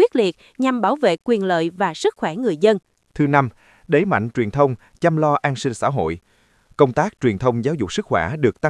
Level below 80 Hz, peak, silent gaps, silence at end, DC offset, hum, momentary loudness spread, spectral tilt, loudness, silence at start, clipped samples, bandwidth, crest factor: -52 dBFS; 0 dBFS; none; 0 s; under 0.1%; none; 6 LU; -6.5 dB/octave; -20 LUFS; 0 s; under 0.1%; 12 kHz; 18 dB